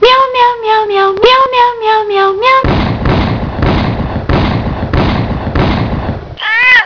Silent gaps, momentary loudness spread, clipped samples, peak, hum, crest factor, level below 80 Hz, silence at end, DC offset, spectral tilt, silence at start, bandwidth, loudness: none; 8 LU; 0.4%; 0 dBFS; none; 10 dB; -22 dBFS; 0 s; under 0.1%; -7 dB/octave; 0 s; 5.4 kHz; -10 LUFS